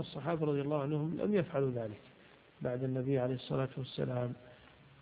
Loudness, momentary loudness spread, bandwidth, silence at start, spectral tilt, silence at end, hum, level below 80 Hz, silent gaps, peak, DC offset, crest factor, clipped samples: -36 LUFS; 9 LU; 4.9 kHz; 0 s; -7 dB/octave; 0.35 s; none; -68 dBFS; none; -20 dBFS; under 0.1%; 16 dB; under 0.1%